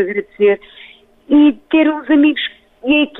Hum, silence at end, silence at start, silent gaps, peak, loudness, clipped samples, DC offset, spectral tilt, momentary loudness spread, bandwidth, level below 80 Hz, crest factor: none; 0 s; 0 s; none; -4 dBFS; -14 LUFS; under 0.1%; under 0.1%; -7.5 dB/octave; 10 LU; 4 kHz; -54 dBFS; 12 dB